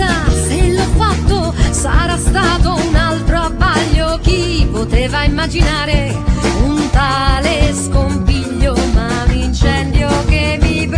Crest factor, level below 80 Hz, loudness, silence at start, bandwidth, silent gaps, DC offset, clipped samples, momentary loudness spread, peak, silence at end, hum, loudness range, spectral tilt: 12 dB; -16 dBFS; -14 LUFS; 0 s; 10.5 kHz; none; under 0.1%; under 0.1%; 2 LU; 0 dBFS; 0 s; none; 1 LU; -5 dB/octave